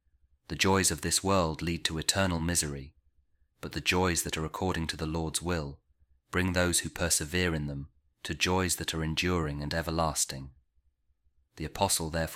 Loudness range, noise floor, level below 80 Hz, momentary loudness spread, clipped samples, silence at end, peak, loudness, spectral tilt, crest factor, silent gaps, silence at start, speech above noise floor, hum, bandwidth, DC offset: 3 LU; -71 dBFS; -48 dBFS; 14 LU; under 0.1%; 0 s; -8 dBFS; -29 LUFS; -3.5 dB/octave; 24 dB; none; 0.5 s; 41 dB; none; 16.5 kHz; under 0.1%